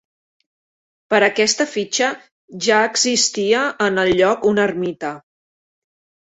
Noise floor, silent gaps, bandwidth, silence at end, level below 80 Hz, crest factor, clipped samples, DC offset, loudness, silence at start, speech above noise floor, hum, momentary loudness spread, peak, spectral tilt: under -90 dBFS; 2.31-2.48 s; 8.4 kHz; 1.05 s; -56 dBFS; 18 dB; under 0.1%; under 0.1%; -17 LUFS; 1.1 s; over 73 dB; none; 9 LU; -2 dBFS; -2.5 dB/octave